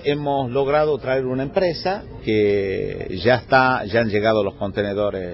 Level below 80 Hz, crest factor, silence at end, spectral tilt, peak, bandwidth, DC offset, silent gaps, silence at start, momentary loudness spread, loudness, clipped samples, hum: -44 dBFS; 16 dB; 0 s; -8.5 dB/octave; -4 dBFS; 5.8 kHz; under 0.1%; none; 0 s; 8 LU; -20 LUFS; under 0.1%; none